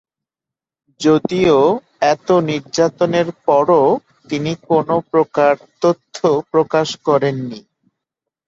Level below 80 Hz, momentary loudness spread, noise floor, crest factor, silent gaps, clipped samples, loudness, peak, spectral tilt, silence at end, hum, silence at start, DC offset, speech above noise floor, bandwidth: -56 dBFS; 9 LU; -87 dBFS; 14 dB; none; under 0.1%; -16 LUFS; -2 dBFS; -6 dB/octave; 0.9 s; none; 1 s; under 0.1%; 72 dB; 8 kHz